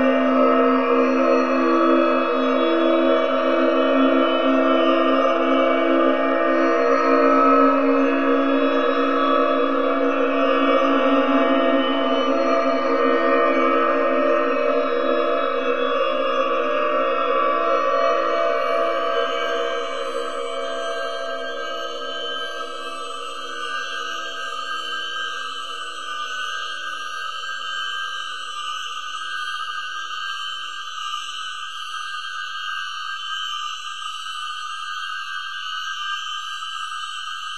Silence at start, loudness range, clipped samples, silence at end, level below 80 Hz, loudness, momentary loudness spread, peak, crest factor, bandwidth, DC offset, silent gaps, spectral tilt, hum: 0 s; 10 LU; under 0.1%; 0 s; -68 dBFS; -21 LUFS; 11 LU; -4 dBFS; 18 dB; 10.5 kHz; 2%; none; -3 dB/octave; none